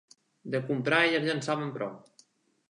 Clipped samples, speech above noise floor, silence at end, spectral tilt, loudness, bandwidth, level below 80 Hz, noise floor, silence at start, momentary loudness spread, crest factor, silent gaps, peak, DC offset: under 0.1%; 35 dB; 0.7 s; -5 dB/octave; -29 LUFS; 11 kHz; -80 dBFS; -64 dBFS; 0.45 s; 14 LU; 22 dB; none; -10 dBFS; under 0.1%